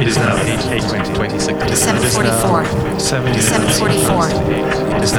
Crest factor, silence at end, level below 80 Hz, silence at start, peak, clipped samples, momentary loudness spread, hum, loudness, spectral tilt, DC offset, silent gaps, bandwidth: 14 dB; 0 s; -32 dBFS; 0 s; 0 dBFS; under 0.1%; 4 LU; none; -15 LUFS; -4 dB/octave; under 0.1%; none; 20 kHz